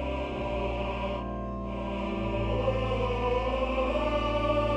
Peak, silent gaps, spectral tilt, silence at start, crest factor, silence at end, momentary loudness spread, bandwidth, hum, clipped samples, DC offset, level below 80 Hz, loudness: -14 dBFS; none; -7.5 dB/octave; 0 s; 16 dB; 0 s; 6 LU; 8.4 kHz; none; under 0.1%; under 0.1%; -36 dBFS; -30 LUFS